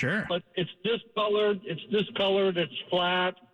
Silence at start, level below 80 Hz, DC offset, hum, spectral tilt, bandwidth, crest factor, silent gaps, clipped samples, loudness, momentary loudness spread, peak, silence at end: 0 s; -66 dBFS; under 0.1%; none; -6.5 dB/octave; 9.2 kHz; 12 dB; none; under 0.1%; -28 LUFS; 6 LU; -16 dBFS; 0.2 s